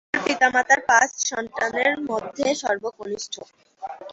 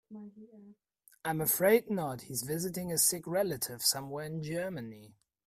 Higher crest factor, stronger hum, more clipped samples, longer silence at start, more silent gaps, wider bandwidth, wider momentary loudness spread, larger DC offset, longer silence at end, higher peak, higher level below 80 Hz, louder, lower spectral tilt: about the same, 20 dB vs 20 dB; neither; neither; about the same, 0.15 s vs 0.1 s; neither; second, 8 kHz vs 16 kHz; about the same, 18 LU vs 16 LU; neither; second, 0 s vs 0.4 s; first, -4 dBFS vs -14 dBFS; first, -62 dBFS vs -70 dBFS; first, -21 LUFS vs -31 LUFS; second, -1.5 dB/octave vs -3 dB/octave